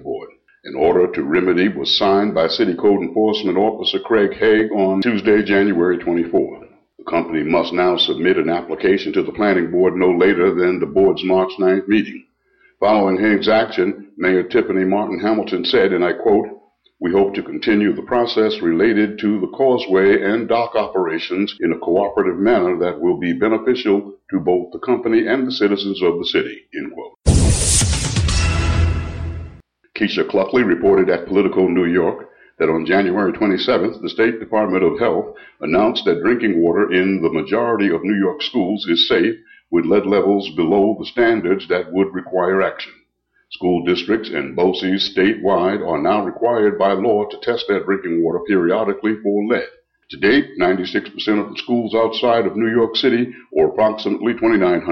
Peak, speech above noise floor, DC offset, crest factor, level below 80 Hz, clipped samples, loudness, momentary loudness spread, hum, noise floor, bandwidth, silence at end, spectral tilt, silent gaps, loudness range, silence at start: -2 dBFS; 47 dB; under 0.1%; 16 dB; -34 dBFS; under 0.1%; -17 LUFS; 6 LU; none; -63 dBFS; 13.5 kHz; 0 s; -5 dB/octave; none; 2 LU; 0 s